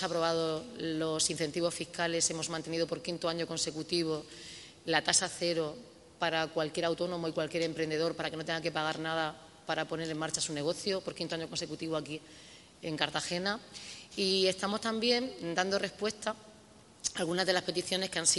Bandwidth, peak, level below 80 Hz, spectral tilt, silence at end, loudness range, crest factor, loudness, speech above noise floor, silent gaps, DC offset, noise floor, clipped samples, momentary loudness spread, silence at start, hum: 11.5 kHz; -8 dBFS; -68 dBFS; -2.5 dB/octave; 0 s; 3 LU; 26 dB; -33 LUFS; 24 dB; none; under 0.1%; -57 dBFS; under 0.1%; 10 LU; 0 s; none